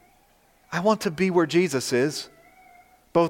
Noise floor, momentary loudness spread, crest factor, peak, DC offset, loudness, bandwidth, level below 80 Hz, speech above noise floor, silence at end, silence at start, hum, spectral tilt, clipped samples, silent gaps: -60 dBFS; 11 LU; 18 dB; -8 dBFS; under 0.1%; -24 LUFS; 16.5 kHz; -64 dBFS; 37 dB; 0 s; 0.7 s; 60 Hz at -55 dBFS; -5 dB/octave; under 0.1%; none